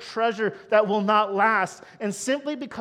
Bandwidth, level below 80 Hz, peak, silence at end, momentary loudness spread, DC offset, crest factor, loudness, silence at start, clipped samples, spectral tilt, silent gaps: 14 kHz; -72 dBFS; -6 dBFS; 0 s; 10 LU; under 0.1%; 18 dB; -24 LUFS; 0 s; under 0.1%; -4 dB/octave; none